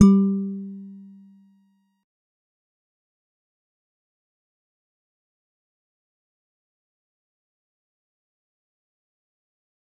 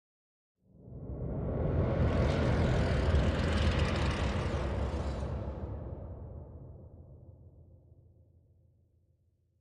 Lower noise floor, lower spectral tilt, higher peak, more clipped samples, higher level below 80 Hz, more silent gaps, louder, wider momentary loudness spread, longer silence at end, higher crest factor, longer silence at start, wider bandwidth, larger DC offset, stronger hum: second, -64 dBFS vs -72 dBFS; first, -9 dB/octave vs -7 dB/octave; first, -2 dBFS vs -16 dBFS; neither; second, -58 dBFS vs -40 dBFS; neither; first, -21 LUFS vs -32 LUFS; first, 26 LU vs 20 LU; first, 9.05 s vs 2 s; first, 28 dB vs 18 dB; second, 0 s vs 0.8 s; about the same, 9.2 kHz vs 10 kHz; neither; neither